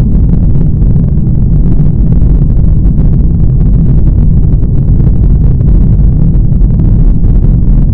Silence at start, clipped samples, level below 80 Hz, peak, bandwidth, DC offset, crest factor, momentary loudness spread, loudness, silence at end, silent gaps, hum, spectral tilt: 0 s; 7%; -8 dBFS; 0 dBFS; 1.7 kHz; under 0.1%; 4 dB; 1 LU; -9 LUFS; 0 s; none; none; -13.5 dB/octave